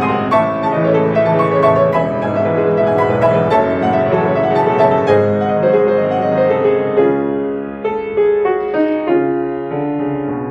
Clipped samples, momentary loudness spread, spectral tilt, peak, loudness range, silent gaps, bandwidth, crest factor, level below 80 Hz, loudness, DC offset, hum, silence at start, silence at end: under 0.1%; 7 LU; -8.5 dB/octave; 0 dBFS; 3 LU; none; 7.4 kHz; 14 dB; -50 dBFS; -14 LUFS; under 0.1%; none; 0 s; 0 s